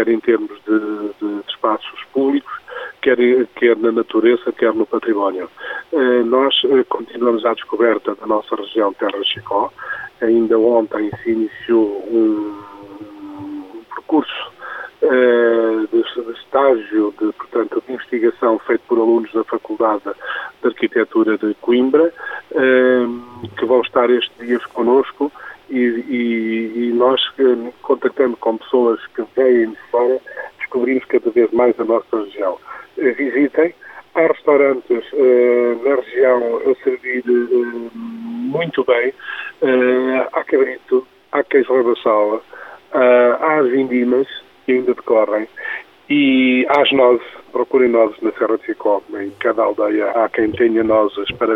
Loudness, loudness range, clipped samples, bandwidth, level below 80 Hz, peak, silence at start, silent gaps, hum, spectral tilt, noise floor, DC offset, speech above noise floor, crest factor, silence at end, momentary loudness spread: -16 LUFS; 3 LU; under 0.1%; 4.6 kHz; -60 dBFS; 0 dBFS; 0 s; none; none; -7 dB/octave; -35 dBFS; under 0.1%; 19 dB; 16 dB; 0 s; 12 LU